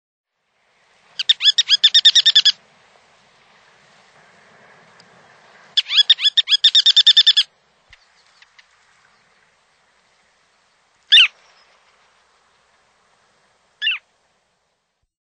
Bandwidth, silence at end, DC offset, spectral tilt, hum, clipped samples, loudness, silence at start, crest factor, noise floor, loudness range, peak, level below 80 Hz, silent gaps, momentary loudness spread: 9.2 kHz; 1.25 s; under 0.1%; 4.5 dB/octave; none; under 0.1%; -12 LUFS; 1.2 s; 20 dB; -71 dBFS; 16 LU; 0 dBFS; -76 dBFS; none; 14 LU